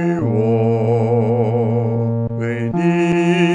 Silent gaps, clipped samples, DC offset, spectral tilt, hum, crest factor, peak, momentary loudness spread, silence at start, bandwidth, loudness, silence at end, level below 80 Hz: none; under 0.1%; under 0.1%; -8 dB/octave; none; 12 dB; -4 dBFS; 5 LU; 0 s; 9.6 kHz; -17 LUFS; 0 s; -52 dBFS